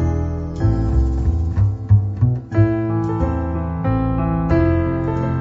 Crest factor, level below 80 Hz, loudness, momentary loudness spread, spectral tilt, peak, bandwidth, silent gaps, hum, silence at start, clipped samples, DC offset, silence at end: 14 dB; -24 dBFS; -19 LUFS; 5 LU; -10.5 dB/octave; -2 dBFS; 6.6 kHz; none; none; 0 s; under 0.1%; under 0.1%; 0 s